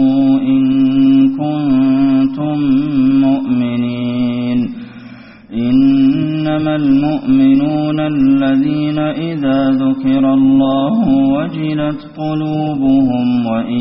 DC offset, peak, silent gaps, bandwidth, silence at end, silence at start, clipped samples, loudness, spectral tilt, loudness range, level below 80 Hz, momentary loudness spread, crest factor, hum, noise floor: under 0.1%; -2 dBFS; none; 5.4 kHz; 0 s; 0 s; under 0.1%; -13 LUFS; -7 dB/octave; 3 LU; -44 dBFS; 7 LU; 10 dB; none; -35 dBFS